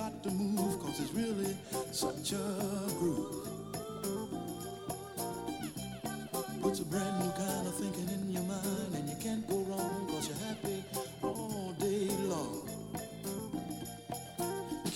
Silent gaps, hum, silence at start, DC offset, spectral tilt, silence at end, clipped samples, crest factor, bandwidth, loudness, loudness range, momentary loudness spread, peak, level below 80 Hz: none; none; 0 s; under 0.1%; -5 dB/octave; 0 s; under 0.1%; 18 dB; 17 kHz; -37 LUFS; 3 LU; 8 LU; -20 dBFS; -64 dBFS